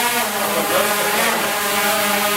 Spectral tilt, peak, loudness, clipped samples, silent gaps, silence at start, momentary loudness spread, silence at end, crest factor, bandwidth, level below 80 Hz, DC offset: -1.5 dB/octave; -4 dBFS; -17 LUFS; under 0.1%; none; 0 s; 2 LU; 0 s; 14 dB; 16 kHz; -56 dBFS; under 0.1%